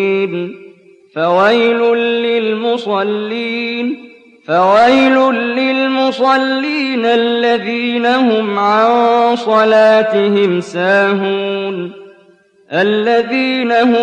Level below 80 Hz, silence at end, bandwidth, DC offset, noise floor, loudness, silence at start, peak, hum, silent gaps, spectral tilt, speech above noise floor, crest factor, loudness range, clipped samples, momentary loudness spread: -60 dBFS; 0 s; 9.2 kHz; under 0.1%; -48 dBFS; -13 LUFS; 0 s; -2 dBFS; none; none; -5.5 dB/octave; 36 dB; 10 dB; 3 LU; under 0.1%; 9 LU